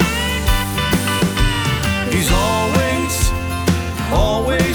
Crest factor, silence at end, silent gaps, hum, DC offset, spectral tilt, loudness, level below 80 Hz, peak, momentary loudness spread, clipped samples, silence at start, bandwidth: 16 dB; 0 s; none; none; under 0.1%; -4.5 dB/octave; -17 LUFS; -24 dBFS; -2 dBFS; 3 LU; under 0.1%; 0 s; over 20 kHz